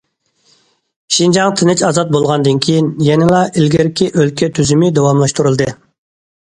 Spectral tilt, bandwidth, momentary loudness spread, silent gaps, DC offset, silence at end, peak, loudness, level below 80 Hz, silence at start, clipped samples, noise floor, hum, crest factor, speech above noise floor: -5.5 dB/octave; 11 kHz; 3 LU; none; under 0.1%; 0.75 s; 0 dBFS; -12 LUFS; -46 dBFS; 1.1 s; under 0.1%; -57 dBFS; none; 12 dB; 46 dB